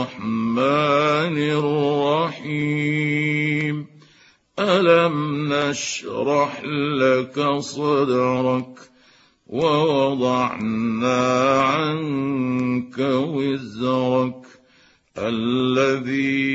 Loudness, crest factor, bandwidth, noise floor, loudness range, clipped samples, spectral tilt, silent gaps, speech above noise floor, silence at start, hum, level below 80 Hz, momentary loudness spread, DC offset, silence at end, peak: -21 LUFS; 18 dB; 8 kHz; -56 dBFS; 3 LU; under 0.1%; -5.5 dB/octave; none; 36 dB; 0 s; none; -62 dBFS; 8 LU; under 0.1%; 0 s; -4 dBFS